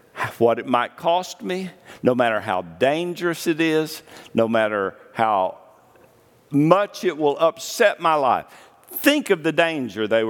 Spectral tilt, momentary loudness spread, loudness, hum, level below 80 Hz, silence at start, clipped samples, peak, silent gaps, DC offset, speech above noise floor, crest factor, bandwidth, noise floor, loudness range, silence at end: -5 dB/octave; 10 LU; -21 LUFS; none; -70 dBFS; 0.15 s; under 0.1%; 0 dBFS; none; under 0.1%; 33 dB; 22 dB; 19 kHz; -54 dBFS; 3 LU; 0 s